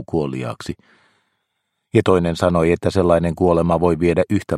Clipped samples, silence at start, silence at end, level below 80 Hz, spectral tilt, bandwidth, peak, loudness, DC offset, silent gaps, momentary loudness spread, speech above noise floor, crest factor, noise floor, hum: under 0.1%; 0 s; 0 s; -40 dBFS; -7.5 dB/octave; 12 kHz; 0 dBFS; -18 LUFS; under 0.1%; none; 12 LU; 57 dB; 18 dB; -74 dBFS; none